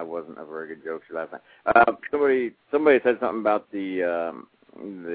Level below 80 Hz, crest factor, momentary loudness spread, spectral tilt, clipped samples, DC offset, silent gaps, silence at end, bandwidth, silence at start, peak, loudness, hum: -62 dBFS; 22 dB; 19 LU; -9 dB/octave; under 0.1%; under 0.1%; none; 0 s; 4.7 kHz; 0 s; -4 dBFS; -23 LUFS; none